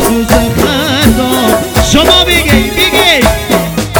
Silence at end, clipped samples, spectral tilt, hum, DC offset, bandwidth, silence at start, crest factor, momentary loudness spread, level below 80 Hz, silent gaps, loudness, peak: 0 s; 3%; -4 dB/octave; none; under 0.1%; over 20 kHz; 0 s; 8 dB; 5 LU; -20 dBFS; none; -8 LUFS; 0 dBFS